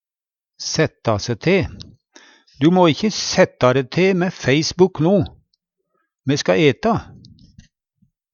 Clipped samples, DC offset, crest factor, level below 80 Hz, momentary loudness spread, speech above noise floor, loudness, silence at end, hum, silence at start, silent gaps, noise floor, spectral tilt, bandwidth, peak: under 0.1%; under 0.1%; 18 dB; -48 dBFS; 8 LU; over 73 dB; -18 LUFS; 1.3 s; none; 0.6 s; none; under -90 dBFS; -5.5 dB/octave; 7.4 kHz; 0 dBFS